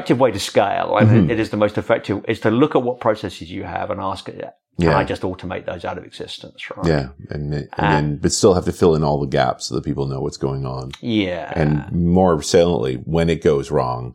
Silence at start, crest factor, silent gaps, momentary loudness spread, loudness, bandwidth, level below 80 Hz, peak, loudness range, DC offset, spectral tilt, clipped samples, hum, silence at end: 0 s; 18 dB; none; 13 LU; -19 LUFS; 15.5 kHz; -40 dBFS; -2 dBFS; 5 LU; under 0.1%; -6 dB/octave; under 0.1%; none; 0 s